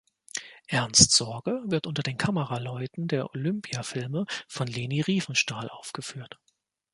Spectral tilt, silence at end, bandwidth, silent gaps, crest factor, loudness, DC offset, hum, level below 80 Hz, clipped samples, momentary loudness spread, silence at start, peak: -3 dB/octave; 0.65 s; 11.5 kHz; none; 26 dB; -26 LUFS; under 0.1%; none; -54 dBFS; under 0.1%; 18 LU; 0.35 s; -2 dBFS